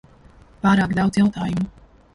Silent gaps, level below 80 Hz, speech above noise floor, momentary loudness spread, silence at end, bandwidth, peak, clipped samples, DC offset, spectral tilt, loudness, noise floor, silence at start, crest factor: none; -46 dBFS; 30 dB; 8 LU; 0.45 s; 11 kHz; -6 dBFS; under 0.1%; under 0.1%; -7 dB/octave; -20 LUFS; -49 dBFS; 0.65 s; 14 dB